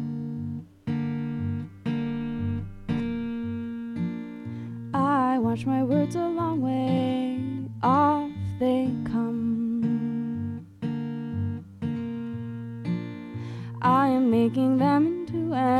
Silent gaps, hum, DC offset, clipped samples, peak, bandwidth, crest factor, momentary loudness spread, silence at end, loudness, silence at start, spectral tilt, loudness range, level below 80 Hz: none; none; under 0.1%; under 0.1%; -10 dBFS; 10.5 kHz; 16 dB; 13 LU; 0 s; -27 LUFS; 0 s; -8.5 dB/octave; 7 LU; -56 dBFS